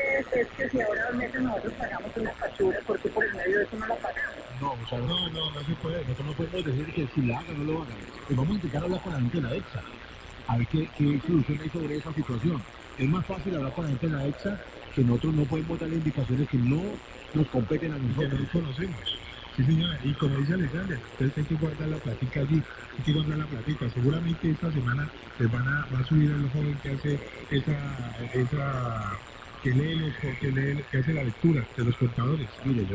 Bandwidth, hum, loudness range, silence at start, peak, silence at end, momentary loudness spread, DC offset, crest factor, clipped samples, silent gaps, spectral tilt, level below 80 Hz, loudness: 7.8 kHz; none; 3 LU; 0 s; -12 dBFS; 0 s; 8 LU; under 0.1%; 18 dB; under 0.1%; none; -7.5 dB/octave; -46 dBFS; -29 LUFS